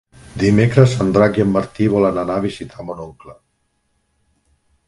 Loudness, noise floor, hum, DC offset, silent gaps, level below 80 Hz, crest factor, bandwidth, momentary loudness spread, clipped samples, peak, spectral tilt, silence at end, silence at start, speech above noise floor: -16 LUFS; -67 dBFS; none; under 0.1%; none; -44 dBFS; 18 dB; 11.5 kHz; 17 LU; under 0.1%; 0 dBFS; -7.5 dB/octave; 1.55 s; 0.35 s; 51 dB